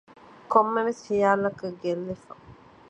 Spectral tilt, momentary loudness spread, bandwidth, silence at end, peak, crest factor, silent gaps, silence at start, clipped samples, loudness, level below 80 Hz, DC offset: -6.5 dB/octave; 11 LU; 9 kHz; 0.35 s; -6 dBFS; 22 dB; none; 0.5 s; under 0.1%; -25 LUFS; -64 dBFS; under 0.1%